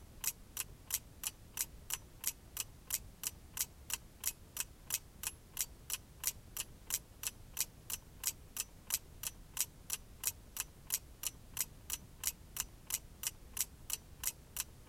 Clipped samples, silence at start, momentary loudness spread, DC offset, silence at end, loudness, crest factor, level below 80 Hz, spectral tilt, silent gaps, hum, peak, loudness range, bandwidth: under 0.1%; 0 s; 5 LU; under 0.1%; 0 s; -41 LUFS; 30 dB; -58 dBFS; 0 dB/octave; none; none; -14 dBFS; 1 LU; 17 kHz